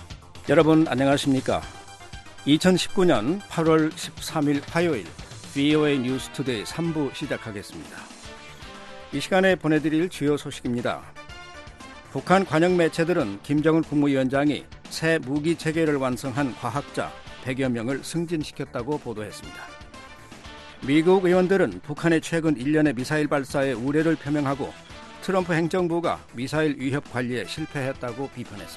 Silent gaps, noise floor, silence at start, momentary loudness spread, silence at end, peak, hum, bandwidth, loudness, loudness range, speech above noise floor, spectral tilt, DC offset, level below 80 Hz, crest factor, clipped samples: none; -43 dBFS; 0 s; 21 LU; 0 s; -4 dBFS; none; 12.5 kHz; -24 LUFS; 6 LU; 20 dB; -6 dB/octave; under 0.1%; -52 dBFS; 20 dB; under 0.1%